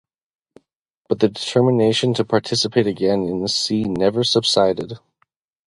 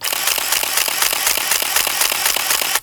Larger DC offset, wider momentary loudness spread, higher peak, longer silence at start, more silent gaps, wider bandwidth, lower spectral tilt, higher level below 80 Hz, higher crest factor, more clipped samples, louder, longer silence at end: neither; first, 5 LU vs 1 LU; about the same, -2 dBFS vs 0 dBFS; first, 1.1 s vs 0 s; neither; second, 11.5 kHz vs over 20 kHz; first, -5 dB/octave vs 2 dB/octave; about the same, -54 dBFS vs -52 dBFS; about the same, 18 dB vs 18 dB; neither; second, -18 LUFS vs -15 LUFS; first, 0.7 s vs 0 s